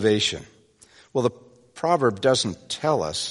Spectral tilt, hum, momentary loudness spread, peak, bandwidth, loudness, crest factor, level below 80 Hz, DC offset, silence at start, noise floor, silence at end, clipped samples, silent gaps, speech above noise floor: -4 dB/octave; none; 8 LU; -6 dBFS; 11.5 kHz; -23 LUFS; 18 dB; -58 dBFS; under 0.1%; 0 s; -54 dBFS; 0 s; under 0.1%; none; 32 dB